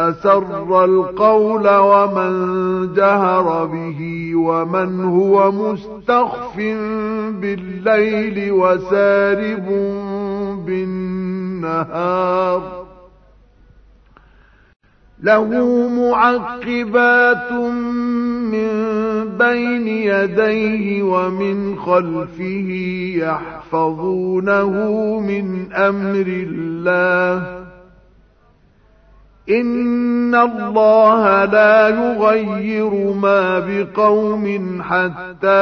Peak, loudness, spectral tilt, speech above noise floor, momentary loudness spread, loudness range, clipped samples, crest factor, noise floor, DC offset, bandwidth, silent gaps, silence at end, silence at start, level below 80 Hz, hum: 0 dBFS; -16 LUFS; -8 dB/octave; 37 dB; 10 LU; 7 LU; under 0.1%; 16 dB; -52 dBFS; under 0.1%; 6.4 kHz; 14.76-14.80 s; 0 s; 0 s; -50 dBFS; none